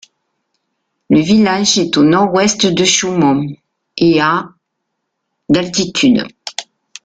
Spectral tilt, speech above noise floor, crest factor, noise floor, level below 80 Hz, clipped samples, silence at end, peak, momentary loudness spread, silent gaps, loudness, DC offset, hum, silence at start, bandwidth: -4 dB/octave; 61 dB; 14 dB; -73 dBFS; -50 dBFS; under 0.1%; 0.45 s; 0 dBFS; 15 LU; none; -12 LUFS; under 0.1%; none; 1.1 s; 9.4 kHz